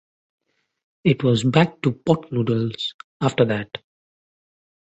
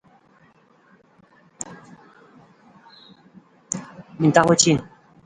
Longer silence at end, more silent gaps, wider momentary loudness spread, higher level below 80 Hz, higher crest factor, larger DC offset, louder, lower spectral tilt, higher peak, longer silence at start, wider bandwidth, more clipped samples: first, 1.1 s vs 0.4 s; first, 2.94-3.20 s vs none; second, 11 LU vs 20 LU; about the same, -56 dBFS vs -60 dBFS; about the same, 20 dB vs 24 dB; neither; about the same, -21 LUFS vs -19 LUFS; first, -6.5 dB/octave vs -4 dB/octave; about the same, -2 dBFS vs 0 dBFS; second, 1.05 s vs 1.6 s; second, 8.4 kHz vs 11 kHz; neither